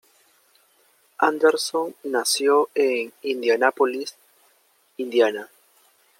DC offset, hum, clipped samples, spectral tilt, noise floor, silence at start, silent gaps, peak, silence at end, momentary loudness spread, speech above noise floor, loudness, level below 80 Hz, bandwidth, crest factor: under 0.1%; none; under 0.1%; -1.5 dB/octave; -62 dBFS; 1.2 s; none; -2 dBFS; 0.75 s; 13 LU; 41 dB; -22 LUFS; -82 dBFS; 16.5 kHz; 20 dB